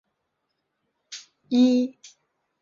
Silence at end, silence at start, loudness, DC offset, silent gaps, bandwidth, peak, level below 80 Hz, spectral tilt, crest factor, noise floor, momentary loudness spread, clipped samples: 0.7 s; 1.1 s; -22 LUFS; under 0.1%; none; 7.4 kHz; -10 dBFS; -74 dBFS; -4.5 dB/octave; 18 dB; -78 dBFS; 21 LU; under 0.1%